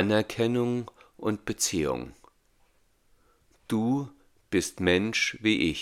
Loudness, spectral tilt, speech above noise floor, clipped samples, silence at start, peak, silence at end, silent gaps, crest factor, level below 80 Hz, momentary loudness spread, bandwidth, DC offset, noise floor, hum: -28 LUFS; -4 dB/octave; 38 dB; under 0.1%; 0 s; -8 dBFS; 0 s; none; 20 dB; -58 dBFS; 9 LU; 17 kHz; under 0.1%; -65 dBFS; none